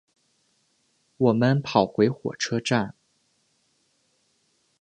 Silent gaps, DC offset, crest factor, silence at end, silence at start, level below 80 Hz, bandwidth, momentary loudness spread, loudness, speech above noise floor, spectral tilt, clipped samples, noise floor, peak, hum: none; under 0.1%; 24 dB; 1.9 s; 1.2 s; -64 dBFS; 9.6 kHz; 7 LU; -24 LUFS; 46 dB; -6 dB/octave; under 0.1%; -69 dBFS; -4 dBFS; none